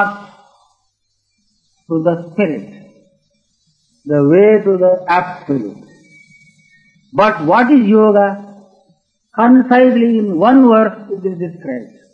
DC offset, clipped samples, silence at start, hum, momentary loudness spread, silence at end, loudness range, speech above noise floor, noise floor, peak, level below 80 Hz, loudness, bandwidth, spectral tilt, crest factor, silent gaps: under 0.1%; under 0.1%; 0 s; none; 16 LU; 0.25 s; 11 LU; 54 dB; -66 dBFS; 0 dBFS; -62 dBFS; -12 LUFS; 6 kHz; -8.5 dB/octave; 14 dB; none